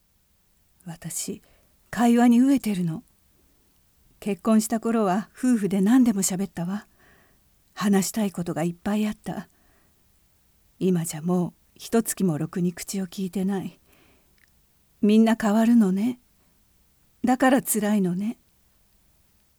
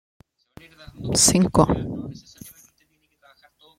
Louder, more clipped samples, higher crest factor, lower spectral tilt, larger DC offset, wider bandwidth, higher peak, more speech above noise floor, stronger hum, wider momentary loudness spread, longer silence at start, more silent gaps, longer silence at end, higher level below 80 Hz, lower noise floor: second, -24 LUFS vs -19 LUFS; neither; about the same, 18 dB vs 22 dB; first, -5.5 dB/octave vs -4 dB/octave; neither; first, 20 kHz vs 16.5 kHz; second, -8 dBFS vs -2 dBFS; about the same, 42 dB vs 45 dB; neither; second, 16 LU vs 24 LU; second, 0.85 s vs 1 s; neither; about the same, 1.25 s vs 1.3 s; second, -60 dBFS vs -44 dBFS; about the same, -65 dBFS vs -66 dBFS